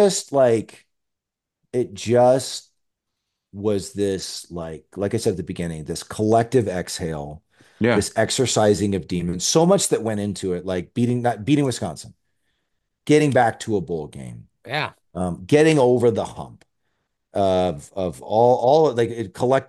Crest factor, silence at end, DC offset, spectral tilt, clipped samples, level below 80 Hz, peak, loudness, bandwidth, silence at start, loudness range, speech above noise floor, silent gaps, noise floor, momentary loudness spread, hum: 18 dB; 0.05 s; under 0.1%; -5 dB/octave; under 0.1%; -52 dBFS; -4 dBFS; -21 LUFS; 12.5 kHz; 0 s; 4 LU; 64 dB; none; -84 dBFS; 15 LU; none